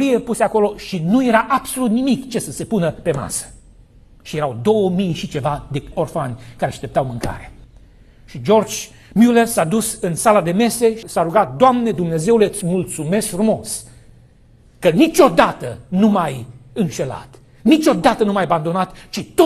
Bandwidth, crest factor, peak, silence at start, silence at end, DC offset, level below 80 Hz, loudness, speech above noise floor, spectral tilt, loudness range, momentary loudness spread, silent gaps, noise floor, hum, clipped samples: 14 kHz; 18 dB; 0 dBFS; 0 s; 0 s; under 0.1%; -44 dBFS; -17 LUFS; 32 dB; -5.5 dB/octave; 6 LU; 12 LU; none; -48 dBFS; none; under 0.1%